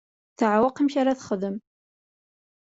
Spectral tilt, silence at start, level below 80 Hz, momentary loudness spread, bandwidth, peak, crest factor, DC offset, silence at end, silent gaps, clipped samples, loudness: -6 dB/octave; 0.4 s; -66 dBFS; 10 LU; 7.8 kHz; -8 dBFS; 18 dB; under 0.1%; 1.15 s; none; under 0.1%; -24 LUFS